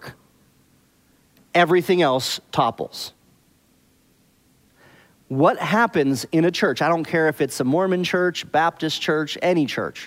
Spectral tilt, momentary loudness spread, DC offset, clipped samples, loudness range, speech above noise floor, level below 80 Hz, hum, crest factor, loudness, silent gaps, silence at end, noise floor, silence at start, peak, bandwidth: -5 dB/octave; 7 LU; under 0.1%; under 0.1%; 6 LU; 39 dB; -64 dBFS; none; 18 dB; -20 LUFS; none; 0 s; -59 dBFS; 0 s; -4 dBFS; 16 kHz